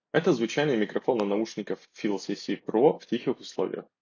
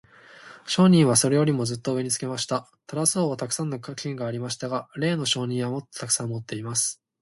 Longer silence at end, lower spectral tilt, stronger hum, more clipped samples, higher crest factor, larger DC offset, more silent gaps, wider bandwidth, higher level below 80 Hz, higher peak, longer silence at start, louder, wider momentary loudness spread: about the same, 0.2 s vs 0.3 s; first, -6 dB/octave vs -4.5 dB/octave; neither; neither; about the same, 18 dB vs 20 dB; neither; neither; second, 7.4 kHz vs 12 kHz; second, -78 dBFS vs -64 dBFS; about the same, -8 dBFS vs -6 dBFS; second, 0.15 s vs 0.4 s; second, -28 LUFS vs -24 LUFS; second, 9 LU vs 13 LU